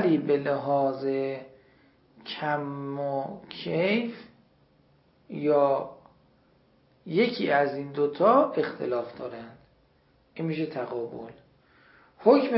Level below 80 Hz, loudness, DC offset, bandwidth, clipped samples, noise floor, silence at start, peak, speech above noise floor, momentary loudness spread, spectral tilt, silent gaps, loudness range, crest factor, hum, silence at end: -72 dBFS; -27 LUFS; under 0.1%; 5.8 kHz; under 0.1%; -64 dBFS; 0 s; -6 dBFS; 38 dB; 18 LU; -10.5 dB/octave; none; 6 LU; 22 dB; none; 0 s